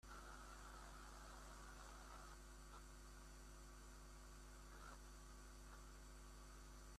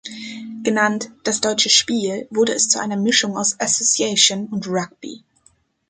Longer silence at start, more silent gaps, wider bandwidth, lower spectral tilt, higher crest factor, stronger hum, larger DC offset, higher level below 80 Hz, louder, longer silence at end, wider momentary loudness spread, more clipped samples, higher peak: about the same, 0.05 s vs 0.05 s; neither; first, 14.5 kHz vs 10 kHz; first, -3.5 dB/octave vs -1.5 dB/octave; second, 12 dB vs 20 dB; neither; neither; about the same, -62 dBFS vs -64 dBFS; second, -61 LUFS vs -17 LUFS; second, 0 s vs 0.7 s; second, 3 LU vs 17 LU; neither; second, -46 dBFS vs -2 dBFS